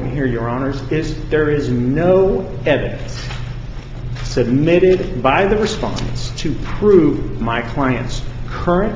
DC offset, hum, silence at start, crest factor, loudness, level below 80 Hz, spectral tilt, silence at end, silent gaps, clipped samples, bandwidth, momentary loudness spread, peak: under 0.1%; none; 0 s; 16 dB; -17 LUFS; -28 dBFS; -7 dB/octave; 0 s; none; under 0.1%; 7.8 kHz; 14 LU; 0 dBFS